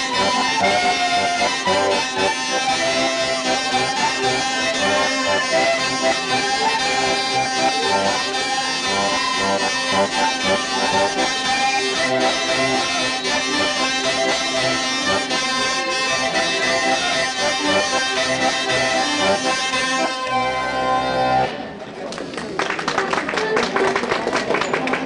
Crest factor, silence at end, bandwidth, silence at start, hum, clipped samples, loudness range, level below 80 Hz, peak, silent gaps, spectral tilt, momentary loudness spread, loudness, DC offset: 14 dB; 0 s; 11.5 kHz; 0 s; none; under 0.1%; 3 LU; -52 dBFS; -6 dBFS; none; -2 dB/octave; 3 LU; -18 LUFS; under 0.1%